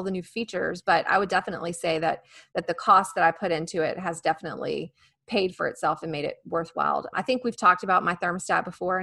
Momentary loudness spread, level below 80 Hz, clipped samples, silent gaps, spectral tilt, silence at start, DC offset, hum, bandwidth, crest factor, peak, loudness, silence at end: 11 LU; -64 dBFS; under 0.1%; none; -4.5 dB/octave; 0 s; under 0.1%; none; 12.5 kHz; 20 dB; -6 dBFS; -26 LUFS; 0 s